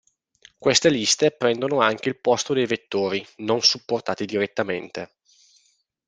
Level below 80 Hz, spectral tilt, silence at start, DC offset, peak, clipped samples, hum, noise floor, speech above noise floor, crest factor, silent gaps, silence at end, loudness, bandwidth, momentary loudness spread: -64 dBFS; -3 dB/octave; 0.6 s; under 0.1%; -2 dBFS; under 0.1%; none; -65 dBFS; 43 dB; 22 dB; none; 1.05 s; -22 LUFS; 10 kHz; 9 LU